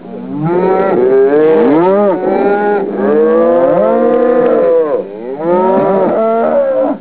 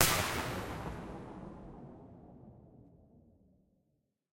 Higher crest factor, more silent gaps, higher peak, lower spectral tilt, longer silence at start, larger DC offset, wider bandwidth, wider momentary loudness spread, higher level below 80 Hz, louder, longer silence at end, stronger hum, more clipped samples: second, 10 dB vs 38 dB; neither; about the same, 0 dBFS vs -2 dBFS; first, -11.5 dB/octave vs -2.5 dB/octave; about the same, 0 s vs 0 s; first, 0.7% vs under 0.1%; second, 4 kHz vs 16.5 kHz; second, 6 LU vs 23 LU; first, -50 dBFS vs -56 dBFS; first, -10 LUFS vs -37 LUFS; second, 0 s vs 1.35 s; neither; neither